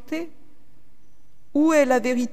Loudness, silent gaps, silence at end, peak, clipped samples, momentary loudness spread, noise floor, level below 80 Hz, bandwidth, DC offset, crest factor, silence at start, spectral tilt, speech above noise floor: -21 LUFS; none; 0.05 s; -6 dBFS; under 0.1%; 14 LU; -59 dBFS; -62 dBFS; 14.5 kHz; 2%; 18 dB; 0.1 s; -4 dB/octave; 39 dB